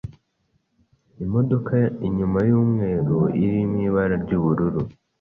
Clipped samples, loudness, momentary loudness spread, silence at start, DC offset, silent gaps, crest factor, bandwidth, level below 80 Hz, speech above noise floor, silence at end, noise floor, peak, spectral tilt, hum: under 0.1%; -21 LUFS; 6 LU; 0.05 s; under 0.1%; none; 14 dB; 4 kHz; -44 dBFS; 49 dB; 0.3 s; -69 dBFS; -6 dBFS; -12 dB/octave; none